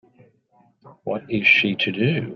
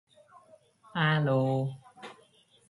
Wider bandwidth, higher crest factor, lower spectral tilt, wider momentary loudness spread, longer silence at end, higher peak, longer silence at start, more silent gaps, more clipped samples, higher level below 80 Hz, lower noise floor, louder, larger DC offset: second, 6.8 kHz vs 11.5 kHz; about the same, 18 dB vs 18 dB; about the same, -6.5 dB/octave vs -7.5 dB/octave; second, 15 LU vs 22 LU; second, 0 s vs 0.55 s; first, -4 dBFS vs -14 dBFS; about the same, 0.85 s vs 0.95 s; neither; neither; first, -60 dBFS vs -72 dBFS; about the same, -60 dBFS vs -63 dBFS; first, -19 LUFS vs -29 LUFS; neither